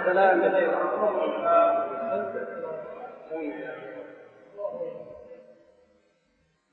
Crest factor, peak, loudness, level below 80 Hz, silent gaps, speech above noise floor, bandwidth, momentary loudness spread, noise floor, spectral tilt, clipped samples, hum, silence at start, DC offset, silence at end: 20 dB; -8 dBFS; -26 LUFS; -74 dBFS; none; 45 dB; 4.3 kHz; 22 LU; -69 dBFS; -8 dB/octave; under 0.1%; none; 0 s; under 0.1%; 1.2 s